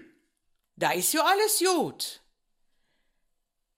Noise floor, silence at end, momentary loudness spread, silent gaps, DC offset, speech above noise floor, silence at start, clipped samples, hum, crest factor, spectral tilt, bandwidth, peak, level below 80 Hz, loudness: -77 dBFS; 1.6 s; 11 LU; none; under 0.1%; 52 dB; 0.8 s; under 0.1%; none; 20 dB; -2 dB/octave; 16 kHz; -10 dBFS; -76 dBFS; -25 LUFS